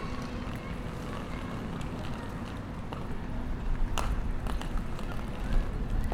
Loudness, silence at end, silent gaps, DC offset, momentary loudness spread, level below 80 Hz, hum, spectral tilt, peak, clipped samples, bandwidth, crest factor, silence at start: -37 LUFS; 0 s; none; under 0.1%; 4 LU; -34 dBFS; none; -6 dB/octave; -10 dBFS; under 0.1%; 14.5 kHz; 22 dB; 0 s